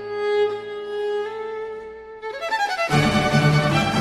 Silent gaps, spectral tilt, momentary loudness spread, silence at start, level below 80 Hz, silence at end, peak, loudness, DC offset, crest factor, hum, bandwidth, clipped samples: none; -5.5 dB/octave; 15 LU; 0 s; -44 dBFS; 0 s; -6 dBFS; -21 LUFS; under 0.1%; 16 dB; none; 13 kHz; under 0.1%